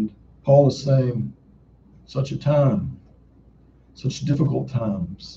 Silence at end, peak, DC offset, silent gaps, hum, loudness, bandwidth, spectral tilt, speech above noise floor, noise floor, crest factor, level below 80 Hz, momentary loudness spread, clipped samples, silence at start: 0 s; -4 dBFS; under 0.1%; none; none; -22 LUFS; 7.6 kHz; -8 dB/octave; 32 dB; -52 dBFS; 20 dB; -50 dBFS; 14 LU; under 0.1%; 0 s